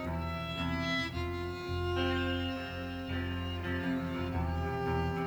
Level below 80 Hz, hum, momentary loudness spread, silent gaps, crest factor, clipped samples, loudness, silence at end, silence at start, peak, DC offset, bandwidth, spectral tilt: -46 dBFS; none; 5 LU; none; 14 dB; under 0.1%; -35 LUFS; 0 s; 0 s; -22 dBFS; under 0.1%; over 20 kHz; -6.5 dB/octave